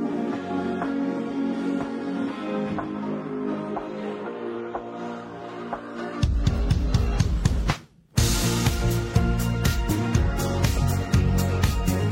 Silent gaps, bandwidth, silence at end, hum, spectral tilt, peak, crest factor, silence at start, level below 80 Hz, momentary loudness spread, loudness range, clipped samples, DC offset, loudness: none; 16.5 kHz; 0 s; none; -6 dB/octave; -6 dBFS; 18 dB; 0 s; -30 dBFS; 10 LU; 7 LU; under 0.1%; under 0.1%; -26 LUFS